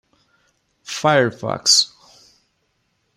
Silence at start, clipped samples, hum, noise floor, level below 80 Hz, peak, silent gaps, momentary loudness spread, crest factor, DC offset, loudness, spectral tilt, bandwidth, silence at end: 0.9 s; under 0.1%; none; -68 dBFS; -64 dBFS; 0 dBFS; none; 11 LU; 22 dB; under 0.1%; -16 LUFS; -2 dB/octave; 16 kHz; 1.3 s